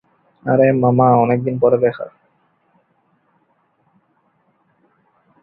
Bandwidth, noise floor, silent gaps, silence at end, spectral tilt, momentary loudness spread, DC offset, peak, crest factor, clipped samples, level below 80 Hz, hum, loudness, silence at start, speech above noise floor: 4.2 kHz; -62 dBFS; none; 3.35 s; -13.5 dB/octave; 17 LU; under 0.1%; -2 dBFS; 18 dB; under 0.1%; -58 dBFS; none; -15 LUFS; 0.45 s; 48 dB